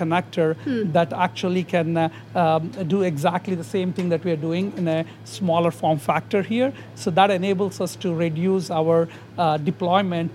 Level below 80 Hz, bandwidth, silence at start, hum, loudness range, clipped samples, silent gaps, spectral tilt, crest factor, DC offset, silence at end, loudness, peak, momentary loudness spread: -68 dBFS; 13.5 kHz; 0 s; none; 2 LU; under 0.1%; none; -6.5 dB/octave; 18 dB; under 0.1%; 0 s; -22 LUFS; -2 dBFS; 5 LU